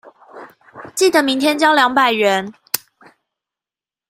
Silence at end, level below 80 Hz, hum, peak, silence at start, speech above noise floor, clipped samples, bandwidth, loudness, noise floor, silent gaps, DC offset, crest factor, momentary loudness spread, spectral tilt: 1.35 s; -66 dBFS; none; 0 dBFS; 0.05 s; over 76 dB; under 0.1%; 16 kHz; -15 LUFS; under -90 dBFS; none; under 0.1%; 18 dB; 11 LU; -2.5 dB/octave